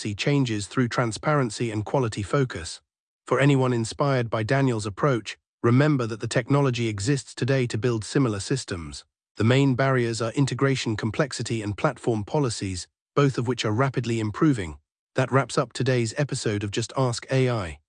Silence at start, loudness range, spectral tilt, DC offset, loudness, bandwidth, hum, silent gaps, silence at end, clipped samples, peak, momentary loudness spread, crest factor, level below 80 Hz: 0 s; 2 LU; -6 dB/octave; under 0.1%; -25 LUFS; 10.5 kHz; none; 3.00-3.20 s, 5.48-5.58 s, 9.31-9.35 s, 13.01-13.06 s, 14.99-15.07 s; 0.1 s; under 0.1%; -8 dBFS; 8 LU; 16 dB; -56 dBFS